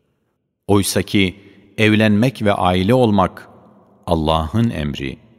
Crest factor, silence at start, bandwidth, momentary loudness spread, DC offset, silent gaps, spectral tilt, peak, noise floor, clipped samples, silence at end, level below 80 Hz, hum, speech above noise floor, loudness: 18 dB; 0.7 s; 16 kHz; 10 LU; under 0.1%; none; -5.5 dB/octave; 0 dBFS; -69 dBFS; under 0.1%; 0.25 s; -38 dBFS; none; 54 dB; -17 LUFS